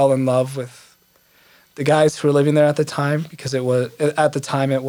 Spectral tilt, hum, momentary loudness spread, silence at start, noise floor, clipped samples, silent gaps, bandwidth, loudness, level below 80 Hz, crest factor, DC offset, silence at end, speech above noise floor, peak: -6 dB/octave; none; 9 LU; 0 s; -56 dBFS; under 0.1%; none; 19.5 kHz; -19 LUFS; -66 dBFS; 16 dB; under 0.1%; 0 s; 38 dB; -2 dBFS